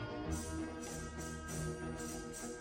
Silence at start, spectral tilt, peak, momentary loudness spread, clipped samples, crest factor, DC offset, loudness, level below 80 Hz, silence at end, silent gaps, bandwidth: 0 s; -4.5 dB/octave; -28 dBFS; 3 LU; under 0.1%; 14 dB; under 0.1%; -43 LUFS; -52 dBFS; 0 s; none; 16.5 kHz